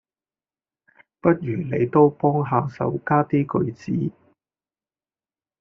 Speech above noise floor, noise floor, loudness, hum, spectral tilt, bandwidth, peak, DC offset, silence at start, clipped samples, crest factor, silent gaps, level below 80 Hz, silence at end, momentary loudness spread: over 69 dB; under -90 dBFS; -22 LUFS; none; -9 dB/octave; 6.6 kHz; -2 dBFS; under 0.1%; 1.25 s; under 0.1%; 20 dB; none; -60 dBFS; 1.5 s; 9 LU